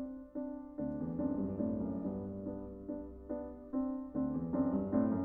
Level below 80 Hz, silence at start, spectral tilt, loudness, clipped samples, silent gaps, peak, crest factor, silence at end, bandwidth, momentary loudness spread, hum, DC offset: -58 dBFS; 0 s; -12.5 dB/octave; -39 LUFS; under 0.1%; none; -20 dBFS; 18 dB; 0 s; 2.2 kHz; 10 LU; none; under 0.1%